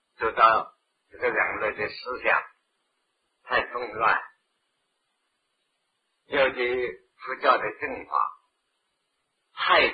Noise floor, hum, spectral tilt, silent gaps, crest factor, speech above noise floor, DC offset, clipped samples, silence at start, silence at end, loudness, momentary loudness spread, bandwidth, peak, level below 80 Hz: -76 dBFS; none; -6 dB/octave; none; 24 dB; 52 dB; under 0.1%; under 0.1%; 0.2 s; 0 s; -25 LUFS; 12 LU; 5 kHz; -4 dBFS; -62 dBFS